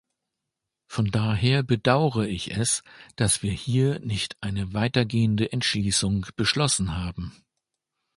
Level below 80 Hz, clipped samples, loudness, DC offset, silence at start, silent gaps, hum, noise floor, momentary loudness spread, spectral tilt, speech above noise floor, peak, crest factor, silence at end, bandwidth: -46 dBFS; under 0.1%; -24 LUFS; under 0.1%; 0.9 s; none; none; -84 dBFS; 7 LU; -4.5 dB/octave; 60 dB; -4 dBFS; 22 dB; 0.85 s; 11.5 kHz